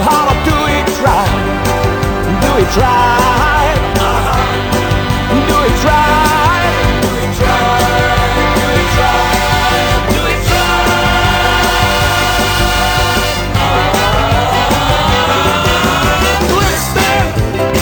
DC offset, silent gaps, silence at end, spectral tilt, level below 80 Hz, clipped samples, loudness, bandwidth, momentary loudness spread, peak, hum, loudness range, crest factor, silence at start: under 0.1%; none; 0 s; -4.5 dB/octave; -20 dBFS; under 0.1%; -11 LUFS; 19.5 kHz; 3 LU; 0 dBFS; none; 1 LU; 10 dB; 0 s